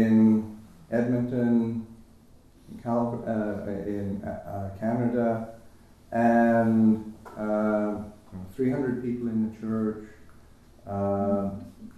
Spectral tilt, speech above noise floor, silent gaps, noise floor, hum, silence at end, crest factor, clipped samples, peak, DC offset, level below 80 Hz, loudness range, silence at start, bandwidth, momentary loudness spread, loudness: -9.5 dB/octave; 28 dB; none; -54 dBFS; none; 0.05 s; 14 dB; under 0.1%; -12 dBFS; under 0.1%; -56 dBFS; 6 LU; 0 s; 6.2 kHz; 19 LU; -27 LUFS